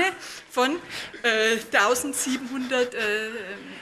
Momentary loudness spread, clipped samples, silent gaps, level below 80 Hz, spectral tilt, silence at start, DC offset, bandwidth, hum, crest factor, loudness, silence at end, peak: 13 LU; under 0.1%; none; -66 dBFS; -1.5 dB/octave; 0 s; under 0.1%; 14.5 kHz; none; 20 dB; -24 LUFS; 0 s; -6 dBFS